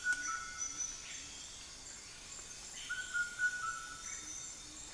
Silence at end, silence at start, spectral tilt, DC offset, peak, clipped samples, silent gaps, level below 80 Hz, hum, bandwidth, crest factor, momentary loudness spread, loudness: 0 s; 0 s; 1 dB/octave; under 0.1%; -22 dBFS; under 0.1%; none; -64 dBFS; none; 10.5 kHz; 20 dB; 12 LU; -41 LUFS